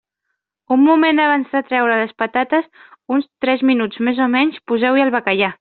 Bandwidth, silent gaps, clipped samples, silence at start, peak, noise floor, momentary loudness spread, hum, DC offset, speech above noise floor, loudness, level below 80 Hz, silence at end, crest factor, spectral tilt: 4.5 kHz; none; under 0.1%; 0.7 s; 0 dBFS; -76 dBFS; 7 LU; none; under 0.1%; 60 dB; -16 LUFS; -64 dBFS; 0.05 s; 16 dB; -2 dB/octave